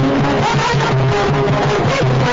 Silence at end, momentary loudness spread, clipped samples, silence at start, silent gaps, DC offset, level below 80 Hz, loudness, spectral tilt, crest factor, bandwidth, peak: 0 s; 0 LU; under 0.1%; 0 s; none; 0.7%; -34 dBFS; -15 LUFS; -6 dB/octave; 8 dB; 7.8 kHz; -6 dBFS